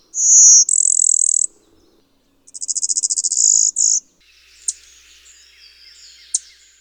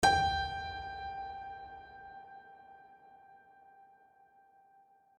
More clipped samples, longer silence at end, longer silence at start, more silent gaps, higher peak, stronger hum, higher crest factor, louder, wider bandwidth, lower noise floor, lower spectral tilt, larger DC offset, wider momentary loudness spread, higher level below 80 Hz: neither; second, 0.4 s vs 1.8 s; first, 0.15 s vs 0 s; neither; first, 0 dBFS vs -14 dBFS; neither; second, 18 dB vs 24 dB; first, -11 LUFS vs -36 LUFS; first, over 20 kHz vs 12 kHz; second, -58 dBFS vs -65 dBFS; second, 5.5 dB/octave vs -3 dB/octave; neither; second, 19 LU vs 27 LU; second, -66 dBFS vs -56 dBFS